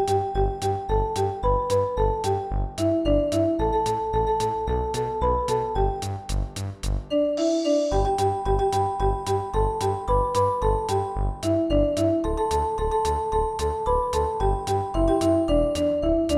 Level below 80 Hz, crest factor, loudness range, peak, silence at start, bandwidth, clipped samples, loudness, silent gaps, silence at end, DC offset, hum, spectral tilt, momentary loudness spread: -32 dBFS; 14 dB; 2 LU; -10 dBFS; 0 s; 14.5 kHz; under 0.1%; -24 LUFS; none; 0 s; under 0.1%; none; -6.5 dB/octave; 5 LU